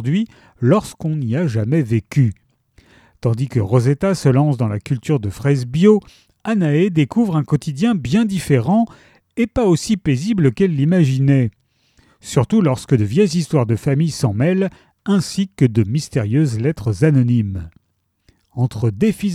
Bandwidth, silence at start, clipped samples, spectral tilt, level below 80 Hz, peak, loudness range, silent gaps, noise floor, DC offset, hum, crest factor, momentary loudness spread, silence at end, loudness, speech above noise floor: 14 kHz; 0 s; under 0.1%; -7.5 dB/octave; -46 dBFS; 0 dBFS; 2 LU; none; -67 dBFS; under 0.1%; none; 16 dB; 7 LU; 0 s; -17 LUFS; 51 dB